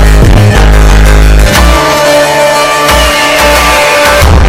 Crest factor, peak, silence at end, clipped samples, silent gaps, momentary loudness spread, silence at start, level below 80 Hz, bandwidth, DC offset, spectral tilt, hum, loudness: 4 dB; 0 dBFS; 0 s; 5%; none; 1 LU; 0 s; -6 dBFS; 16.5 kHz; under 0.1%; -4 dB/octave; none; -5 LUFS